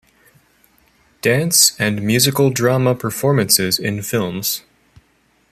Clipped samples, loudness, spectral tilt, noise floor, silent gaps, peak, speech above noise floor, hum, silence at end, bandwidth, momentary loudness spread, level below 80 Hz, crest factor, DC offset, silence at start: under 0.1%; -16 LUFS; -3.5 dB/octave; -59 dBFS; none; 0 dBFS; 43 dB; none; 0.9 s; 15 kHz; 9 LU; -54 dBFS; 18 dB; under 0.1%; 1.25 s